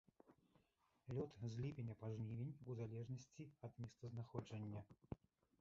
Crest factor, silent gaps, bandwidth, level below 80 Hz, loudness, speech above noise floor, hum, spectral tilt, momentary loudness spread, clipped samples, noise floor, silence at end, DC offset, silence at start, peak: 22 dB; none; 7.6 kHz; -74 dBFS; -52 LUFS; 32 dB; none; -8.5 dB/octave; 10 LU; under 0.1%; -83 dBFS; 0.45 s; under 0.1%; 0.25 s; -30 dBFS